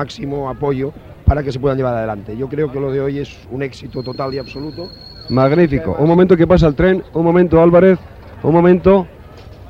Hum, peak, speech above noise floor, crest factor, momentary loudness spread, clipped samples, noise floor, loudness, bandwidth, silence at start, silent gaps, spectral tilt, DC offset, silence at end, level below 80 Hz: none; 0 dBFS; 22 dB; 14 dB; 16 LU; under 0.1%; -36 dBFS; -15 LUFS; 7.4 kHz; 0 s; none; -9 dB/octave; under 0.1%; 0 s; -30 dBFS